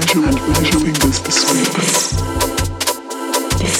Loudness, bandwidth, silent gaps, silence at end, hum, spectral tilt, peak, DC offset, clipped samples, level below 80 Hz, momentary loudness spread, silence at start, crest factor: -15 LUFS; 18 kHz; none; 0 s; none; -3.5 dB/octave; 0 dBFS; under 0.1%; under 0.1%; -28 dBFS; 6 LU; 0 s; 16 dB